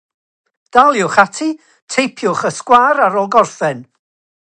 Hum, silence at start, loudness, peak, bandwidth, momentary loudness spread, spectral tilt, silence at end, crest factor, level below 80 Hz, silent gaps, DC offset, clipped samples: none; 0.75 s; -13 LUFS; 0 dBFS; 10.5 kHz; 10 LU; -4 dB/octave; 0.6 s; 14 dB; -58 dBFS; 1.82-1.87 s; under 0.1%; under 0.1%